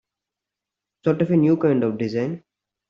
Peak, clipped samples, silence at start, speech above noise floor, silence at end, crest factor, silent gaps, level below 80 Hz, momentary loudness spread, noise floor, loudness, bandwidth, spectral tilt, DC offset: -6 dBFS; under 0.1%; 1.05 s; 67 dB; 0.5 s; 16 dB; none; -64 dBFS; 10 LU; -86 dBFS; -21 LUFS; 6.8 kHz; -9.5 dB/octave; under 0.1%